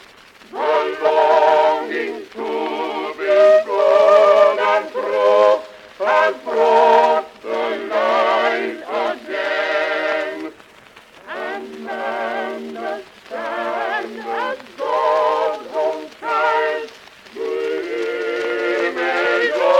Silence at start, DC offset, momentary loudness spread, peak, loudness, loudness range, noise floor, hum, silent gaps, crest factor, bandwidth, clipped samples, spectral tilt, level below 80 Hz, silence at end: 0.5 s; under 0.1%; 15 LU; -2 dBFS; -18 LUFS; 10 LU; -45 dBFS; none; none; 16 dB; 10.5 kHz; under 0.1%; -3 dB/octave; -66 dBFS; 0 s